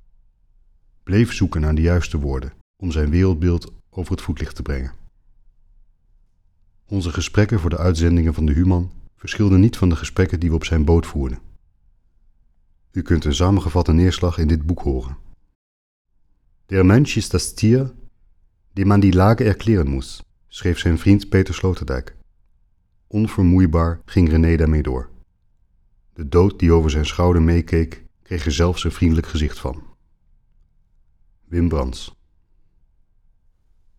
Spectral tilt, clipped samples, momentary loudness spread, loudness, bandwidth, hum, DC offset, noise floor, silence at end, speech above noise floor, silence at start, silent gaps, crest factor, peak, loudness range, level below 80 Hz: -7 dB/octave; under 0.1%; 14 LU; -19 LUFS; 12 kHz; none; under 0.1%; -59 dBFS; 1.9 s; 42 dB; 1.05 s; 2.61-2.74 s, 15.55-16.05 s; 18 dB; -2 dBFS; 8 LU; -28 dBFS